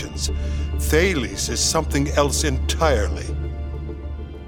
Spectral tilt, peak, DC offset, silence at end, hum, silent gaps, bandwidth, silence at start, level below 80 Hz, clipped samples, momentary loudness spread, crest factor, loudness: -4 dB/octave; -2 dBFS; under 0.1%; 0 s; none; none; 18.5 kHz; 0 s; -26 dBFS; under 0.1%; 12 LU; 20 dB; -22 LUFS